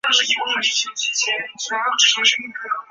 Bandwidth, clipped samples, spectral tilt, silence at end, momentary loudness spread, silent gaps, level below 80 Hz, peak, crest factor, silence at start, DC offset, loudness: 8.4 kHz; under 0.1%; 2.5 dB/octave; 0.1 s; 11 LU; none; -74 dBFS; -2 dBFS; 18 dB; 0.05 s; under 0.1%; -18 LUFS